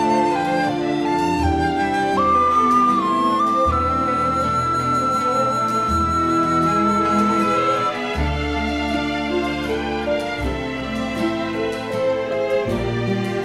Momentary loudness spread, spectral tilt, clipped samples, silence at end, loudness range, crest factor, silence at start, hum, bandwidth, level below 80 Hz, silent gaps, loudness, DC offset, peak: 6 LU; -6 dB/octave; under 0.1%; 0 s; 5 LU; 14 dB; 0 s; none; 14.5 kHz; -36 dBFS; none; -19 LUFS; under 0.1%; -6 dBFS